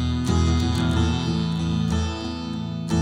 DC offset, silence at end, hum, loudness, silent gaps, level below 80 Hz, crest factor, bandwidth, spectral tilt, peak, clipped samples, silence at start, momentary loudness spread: under 0.1%; 0 s; none; -24 LUFS; none; -32 dBFS; 14 dB; 11.5 kHz; -6 dB/octave; -8 dBFS; under 0.1%; 0 s; 8 LU